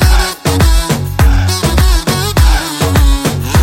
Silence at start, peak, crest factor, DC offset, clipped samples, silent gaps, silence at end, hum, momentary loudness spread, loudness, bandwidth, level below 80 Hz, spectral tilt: 0 s; 0 dBFS; 10 dB; under 0.1%; under 0.1%; none; 0 s; none; 3 LU; -12 LUFS; 17 kHz; -12 dBFS; -4.5 dB/octave